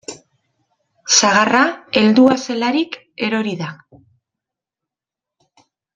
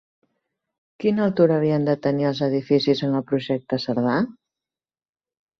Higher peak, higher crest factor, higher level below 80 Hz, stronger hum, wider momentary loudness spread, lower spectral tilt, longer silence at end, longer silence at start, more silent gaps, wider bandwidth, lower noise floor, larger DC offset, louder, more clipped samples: first, 0 dBFS vs -4 dBFS; about the same, 18 dB vs 18 dB; about the same, -62 dBFS vs -64 dBFS; neither; first, 16 LU vs 6 LU; second, -3 dB/octave vs -8 dB/octave; first, 2.2 s vs 1.3 s; second, 0.1 s vs 1 s; neither; first, 9.4 kHz vs 6.4 kHz; about the same, -87 dBFS vs under -90 dBFS; neither; first, -15 LUFS vs -22 LUFS; neither